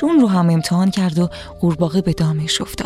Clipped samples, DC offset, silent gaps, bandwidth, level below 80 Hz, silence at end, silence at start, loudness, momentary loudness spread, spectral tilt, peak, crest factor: under 0.1%; under 0.1%; none; 14 kHz; -42 dBFS; 0 s; 0 s; -17 LUFS; 7 LU; -6 dB/octave; -4 dBFS; 12 dB